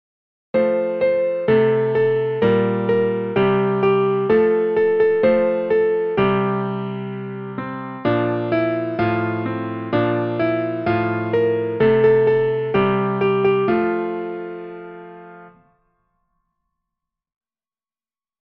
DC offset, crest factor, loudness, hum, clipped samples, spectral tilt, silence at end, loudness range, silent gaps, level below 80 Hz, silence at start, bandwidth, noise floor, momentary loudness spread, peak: under 0.1%; 14 dB; -19 LUFS; none; under 0.1%; -10 dB/octave; 3.05 s; 5 LU; none; -56 dBFS; 0.55 s; 5.4 kHz; under -90 dBFS; 12 LU; -4 dBFS